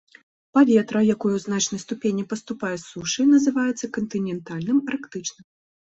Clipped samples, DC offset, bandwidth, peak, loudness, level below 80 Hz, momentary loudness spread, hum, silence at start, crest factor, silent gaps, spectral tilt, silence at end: under 0.1%; under 0.1%; 8.2 kHz; -4 dBFS; -23 LUFS; -64 dBFS; 12 LU; none; 0.55 s; 18 dB; none; -4.5 dB/octave; 0.6 s